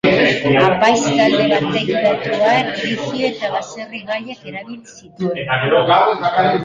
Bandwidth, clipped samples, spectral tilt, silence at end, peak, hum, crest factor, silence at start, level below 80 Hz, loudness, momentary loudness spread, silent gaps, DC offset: 9.4 kHz; under 0.1%; -5 dB/octave; 0 s; -2 dBFS; none; 14 dB; 0.05 s; -52 dBFS; -16 LUFS; 16 LU; none; under 0.1%